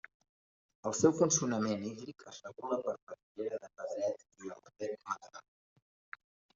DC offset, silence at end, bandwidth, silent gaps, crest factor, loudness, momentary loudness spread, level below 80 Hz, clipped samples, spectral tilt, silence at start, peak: under 0.1%; 1.15 s; 7.8 kHz; 3.02-3.07 s, 3.23-3.35 s; 24 dB; -35 LUFS; 23 LU; -78 dBFS; under 0.1%; -6 dB/octave; 0.85 s; -12 dBFS